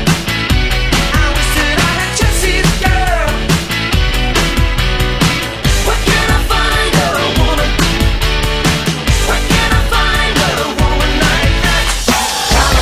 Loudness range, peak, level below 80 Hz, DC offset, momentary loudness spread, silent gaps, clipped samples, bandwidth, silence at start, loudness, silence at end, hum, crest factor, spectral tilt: 1 LU; 0 dBFS; -16 dBFS; under 0.1%; 3 LU; none; under 0.1%; 16 kHz; 0 s; -12 LUFS; 0 s; none; 12 dB; -3.5 dB/octave